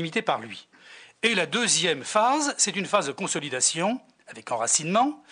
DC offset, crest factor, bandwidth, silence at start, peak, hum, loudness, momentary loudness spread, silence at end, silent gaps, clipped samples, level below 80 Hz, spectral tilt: under 0.1%; 18 dB; 10 kHz; 0 s; -8 dBFS; none; -24 LUFS; 10 LU; 0.15 s; none; under 0.1%; -76 dBFS; -2 dB/octave